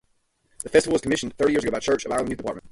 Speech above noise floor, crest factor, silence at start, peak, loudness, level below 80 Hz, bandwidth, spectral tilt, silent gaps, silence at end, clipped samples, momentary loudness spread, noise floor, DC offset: 45 dB; 20 dB; 0.65 s; -4 dBFS; -23 LUFS; -50 dBFS; 11.5 kHz; -4 dB/octave; none; 0.05 s; under 0.1%; 9 LU; -68 dBFS; under 0.1%